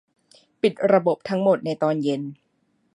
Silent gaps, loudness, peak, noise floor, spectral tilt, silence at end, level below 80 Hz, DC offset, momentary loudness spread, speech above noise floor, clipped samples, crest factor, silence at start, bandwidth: none; -22 LUFS; -4 dBFS; -68 dBFS; -7.5 dB/octave; 0.6 s; -72 dBFS; under 0.1%; 8 LU; 47 dB; under 0.1%; 20 dB; 0.65 s; 11 kHz